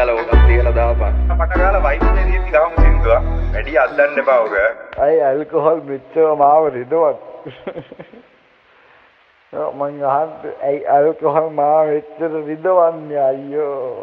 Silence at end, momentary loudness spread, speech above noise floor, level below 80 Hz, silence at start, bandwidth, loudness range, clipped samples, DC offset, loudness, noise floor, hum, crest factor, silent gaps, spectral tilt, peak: 0 s; 10 LU; 35 dB; -20 dBFS; 0 s; 4.6 kHz; 9 LU; under 0.1%; under 0.1%; -16 LUFS; -52 dBFS; none; 14 dB; none; -9.5 dB/octave; -2 dBFS